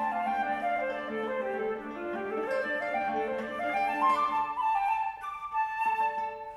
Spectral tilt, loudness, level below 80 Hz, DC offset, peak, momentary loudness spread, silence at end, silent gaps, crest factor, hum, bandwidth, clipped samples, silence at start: -5 dB/octave; -31 LUFS; -66 dBFS; under 0.1%; -14 dBFS; 8 LU; 0 s; none; 16 dB; none; 13 kHz; under 0.1%; 0 s